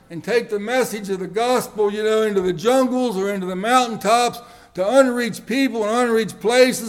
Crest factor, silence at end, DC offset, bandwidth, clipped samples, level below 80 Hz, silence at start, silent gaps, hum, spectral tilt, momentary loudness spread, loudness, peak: 18 dB; 0 s; under 0.1%; 17 kHz; under 0.1%; -58 dBFS; 0.1 s; none; none; -4 dB/octave; 8 LU; -19 LUFS; 0 dBFS